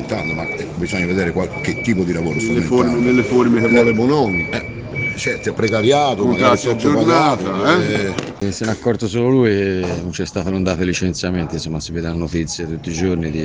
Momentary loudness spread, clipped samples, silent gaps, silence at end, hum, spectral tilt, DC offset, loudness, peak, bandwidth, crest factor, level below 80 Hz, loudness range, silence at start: 10 LU; under 0.1%; none; 0 s; none; -5.5 dB/octave; under 0.1%; -17 LUFS; 0 dBFS; 9.8 kHz; 16 dB; -40 dBFS; 4 LU; 0 s